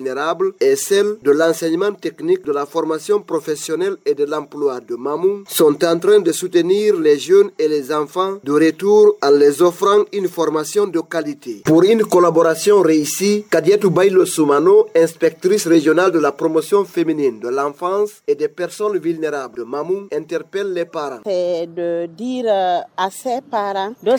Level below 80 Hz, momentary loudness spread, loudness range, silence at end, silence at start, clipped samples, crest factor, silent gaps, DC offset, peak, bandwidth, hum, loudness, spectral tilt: -68 dBFS; 10 LU; 7 LU; 0 s; 0 s; under 0.1%; 14 dB; none; under 0.1%; -2 dBFS; over 20 kHz; none; -16 LUFS; -4.5 dB/octave